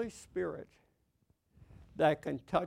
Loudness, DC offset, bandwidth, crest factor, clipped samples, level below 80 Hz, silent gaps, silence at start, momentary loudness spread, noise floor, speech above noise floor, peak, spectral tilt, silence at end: -35 LUFS; under 0.1%; 15 kHz; 22 dB; under 0.1%; -64 dBFS; none; 0 s; 16 LU; -75 dBFS; 40 dB; -16 dBFS; -6 dB/octave; 0 s